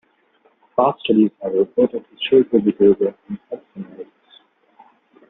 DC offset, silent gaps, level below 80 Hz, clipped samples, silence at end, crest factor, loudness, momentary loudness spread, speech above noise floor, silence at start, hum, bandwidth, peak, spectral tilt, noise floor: under 0.1%; none; -62 dBFS; under 0.1%; 1.25 s; 16 dB; -18 LUFS; 20 LU; 41 dB; 0.8 s; none; 3.9 kHz; -2 dBFS; -5 dB/octave; -59 dBFS